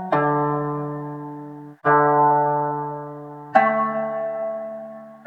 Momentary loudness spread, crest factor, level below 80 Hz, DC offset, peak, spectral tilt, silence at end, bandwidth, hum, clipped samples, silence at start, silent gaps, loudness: 19 LU; 20 dB; -62 dBFS; under 0.1%; -2 dBFS; -9 dB/octave; 0.1 s; 5.6 kHz; none; under 0.1%; 0 s; none; -21 LUFS